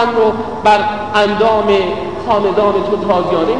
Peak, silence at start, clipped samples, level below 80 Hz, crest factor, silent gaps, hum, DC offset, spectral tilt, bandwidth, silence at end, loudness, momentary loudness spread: 0 dBFS; 0 s; under 0.1%; -42 dBFS; 14 dB; none; none; 1%; -6 dB/octave; 10 kHz; 0 s; -13 LUFS; 4 LU